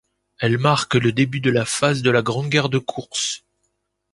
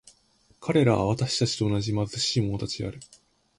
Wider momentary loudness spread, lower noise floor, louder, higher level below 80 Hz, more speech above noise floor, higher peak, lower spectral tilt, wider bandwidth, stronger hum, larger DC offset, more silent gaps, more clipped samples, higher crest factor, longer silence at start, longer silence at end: second, 7 LU vs 12 LU; first, -72 dBFS vs -63 dBFS; first, -20 LUFS vs -26 LUFS; about the same, -56 dBFS vs -52 dBFS; first, 53 dB vs 38 dB; first, -2 dBFS vs -8 dBFS; about the same, -4.5 dB/octave vs -5.5 dB/octave; about the same, 11.5 kHz vs 11.5 kHz; neither; neither; neither; neither; about the same, 20 dB vs 18 dB; second, 0.4 s vs 0.6 s; first, 0.75 s vs 0.55 s